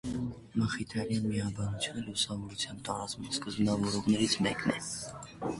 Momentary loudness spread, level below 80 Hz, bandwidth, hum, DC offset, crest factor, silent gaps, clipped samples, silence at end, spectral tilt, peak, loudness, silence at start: 9 LU; -56 dBFS; 11.5 kHz; none; under 0.1%; 18 dB; none; under 0.1%; 0 s; -4.5 dB/octave; -14 dBFS; -33 LUFS; 0.05 s